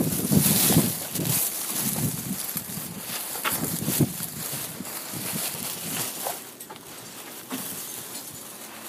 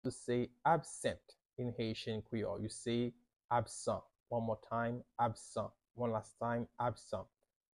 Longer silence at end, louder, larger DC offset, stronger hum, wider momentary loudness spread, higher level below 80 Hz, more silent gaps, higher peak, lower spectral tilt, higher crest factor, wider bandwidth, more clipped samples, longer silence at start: second, 0 s vs 0.55 s; first, -26 LUFS vs -40 LUFS; neither; neither; first, 18 LU vs 9 LU; first, -56 dBFS vs -68 dBFS; second, none vs 3.45-3.49 s, 4.20-4.24 s; first, -6 dBFS vs -18 dBFS; second, -3.5 dB/octave vs -5.5 dB/octave; about the same, 22 dB vs 22 dB; first, 16 kHz vs 12 kHz; neither; about the same, 0 s vs 0.05 s